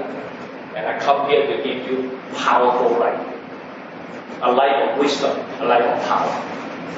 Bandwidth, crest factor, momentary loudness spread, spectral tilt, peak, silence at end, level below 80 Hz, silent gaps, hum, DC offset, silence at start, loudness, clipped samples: 8 kHz; 18 dB; 17 LU; -4.5 dB/octave; -2 dBFS; 0 s; -68 dBFS; none; none; under 0.1%; 0 s; -19 LUFS; under 0.1%